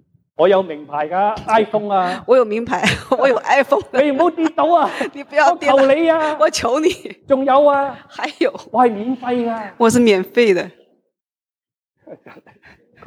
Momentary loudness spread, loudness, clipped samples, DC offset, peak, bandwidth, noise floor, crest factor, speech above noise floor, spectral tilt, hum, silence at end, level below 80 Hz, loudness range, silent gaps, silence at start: 9 LU; -16 LUFS; under 0.1%; under 0.1%; -2 dBFS; 15.5 kHz; under -90 dBFS; 16 dB; over 74 dB; -4.5 dB/octave; none; 0.75 s; -54 dBFS; 3 LU; 11.77-11.81 s; 0.4 s